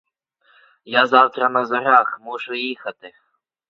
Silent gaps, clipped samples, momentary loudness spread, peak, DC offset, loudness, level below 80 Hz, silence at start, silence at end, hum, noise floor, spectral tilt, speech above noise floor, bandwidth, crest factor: none; under 0.1%; 14 LU; 0 dBFS; under 0.1%; -18 LUFS; -74 dBFS; 0.85 s; 0.6 s; none; -61 dBFS; -5 dB/octave; 42 dB; 7.2 kHz; 20 dB